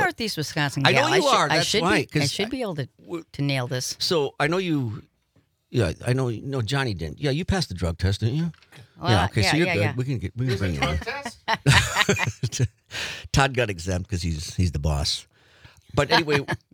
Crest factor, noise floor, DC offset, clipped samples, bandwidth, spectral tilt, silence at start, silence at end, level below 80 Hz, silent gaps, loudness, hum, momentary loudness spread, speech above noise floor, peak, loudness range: 20 dB; -65 dBFS; under 0.1%; under 0.1%; 19 kHz; -4.5 dB/octave; 0 s; 0.15 s; -42 dBFS; none; -24 LUFS; none; 10 LU; 42 dB; -4 dBFS; 4 LU